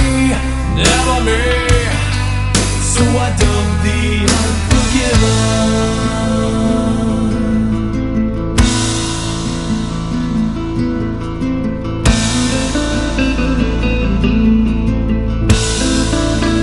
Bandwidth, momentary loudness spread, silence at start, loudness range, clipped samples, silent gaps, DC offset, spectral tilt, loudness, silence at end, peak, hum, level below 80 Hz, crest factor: 11.5 kHz; 6 LU; 0 s; 3 LU; under 0.1%; none; 1%; -5 dB/octave; -15 LUFS; 0 s; 0 dBFS; none; -20 dBFS; 14 dB